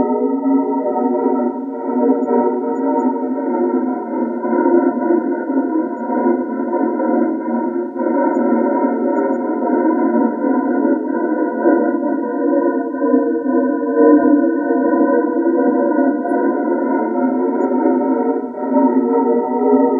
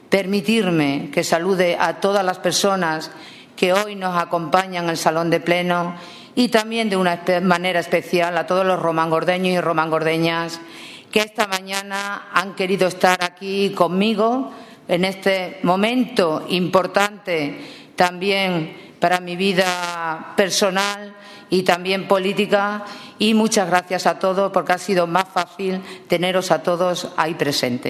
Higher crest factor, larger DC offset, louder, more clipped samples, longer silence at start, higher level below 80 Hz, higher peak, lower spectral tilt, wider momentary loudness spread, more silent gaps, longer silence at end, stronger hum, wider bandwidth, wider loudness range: second, 14 dB vs 20 dB; neither; first, -16 LUFS vs -19 LUFS; neither; about the same, 0 s vs 0.1 s; about the same, -68 dBFS vs -66 dBFS; about the same, 0 dBFS vs 0 dBFS; first, -10.5 dB/octave vs -4.5 dB/octave; second, 5 LU vs 8 LU; neither; about the same, 0 s vs 0 s; neither; second, 2.3 kHz vs 14 kHz; about the same, 3 LU vs 2 LU